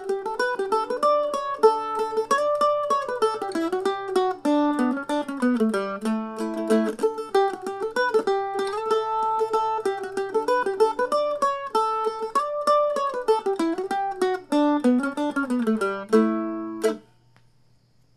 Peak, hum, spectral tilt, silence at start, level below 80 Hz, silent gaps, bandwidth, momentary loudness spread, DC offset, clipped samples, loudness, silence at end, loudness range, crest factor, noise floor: -6 dBFS; none; -5 dB/octave; 0 s; -62 dBFS; none; 13.5 kHz; 6 LU; under 0.1%; under 0.1%; -24 LUFS; 1.15 s; 2 LU; 18 dB; -61 dBFS